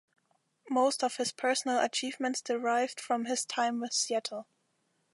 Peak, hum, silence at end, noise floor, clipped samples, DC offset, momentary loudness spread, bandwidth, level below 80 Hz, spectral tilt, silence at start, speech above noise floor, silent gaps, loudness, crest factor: -14 dBFS; none; 0.7 s; -76 dBFS; under 0.1%; under 0.1%; 5 LU; 11.5 kHz; -88 dBFS; -1.5 dB/octave; 0.65 s; 45 dB; none; -31 LUFS; 18 dB